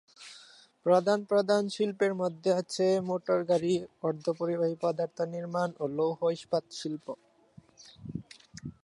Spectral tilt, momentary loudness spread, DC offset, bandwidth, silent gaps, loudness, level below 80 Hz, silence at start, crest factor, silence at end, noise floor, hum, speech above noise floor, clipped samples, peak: -6 dB/octave; 19 LU; under 0.1%; 11.5 kHz; none; -30 LUFS; -70 dBFS; 0.2 s; 18 dB; 0.15 s; -58 dBFS; none; 29 dB; under 0.1%; -12 dBFS